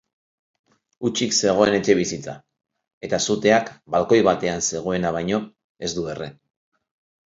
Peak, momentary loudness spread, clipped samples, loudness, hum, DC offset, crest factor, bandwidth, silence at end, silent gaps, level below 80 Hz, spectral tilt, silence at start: -2 dBFS; 16 LU; under 0.1%; -21 LUFS; none; under 0.1%; 20 dB; 7.8 kHz; 0.95 s; 2.93-3.01 s, 5.64-5.75 s; -54 dBFS; -4 dB/octave; 1 s